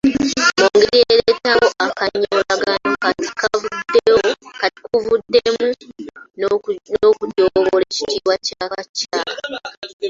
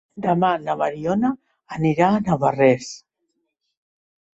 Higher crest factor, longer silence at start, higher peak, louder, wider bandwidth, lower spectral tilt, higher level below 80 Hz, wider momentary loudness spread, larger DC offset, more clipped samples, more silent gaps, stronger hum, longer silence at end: about the same, 16 dB vs 18 dB; about the same, 0.05 s vs 0.15 s; first, 0 dBFS vs -4 dBFS; first, -17 LUFS vs -20 LUFS; about the same, 7.8 kHz vs 8 kHz; second, -3 dB/octave vs -7 dB/octave; about the same, -52 dBFS vs -56 dBFS; second, 11 LU vs 18 LU; neither; neither; first, 8.89-8.94 s, 9.77-9.82 s, 9.93-10.00 s vs none; neither; second, 0 s vs 1.4 s